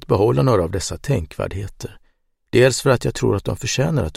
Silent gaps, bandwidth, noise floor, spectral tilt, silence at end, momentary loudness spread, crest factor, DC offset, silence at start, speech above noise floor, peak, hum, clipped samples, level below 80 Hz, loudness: none; 15.5 kHz; -61 dBFS; -5.5 dB/octave; 0 s; 13 LU; 16 dB; under 0.1%; 0 s; 42 dB; -2 dBFS; none; under 0.1%; -38 dBFS; -19 LUFS